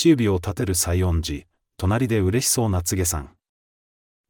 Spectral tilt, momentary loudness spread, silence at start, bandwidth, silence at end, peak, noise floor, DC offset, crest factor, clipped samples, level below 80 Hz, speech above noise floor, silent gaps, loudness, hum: -5 dB/octave; 8 LU; 0 s; 18 kHz; 1.05 s; -6 dBFS; under -90 dBFS; under 0.1%; 16 dB; under 0.1%; -42 dBFS; over 69 dB; none; -22 LUFS; none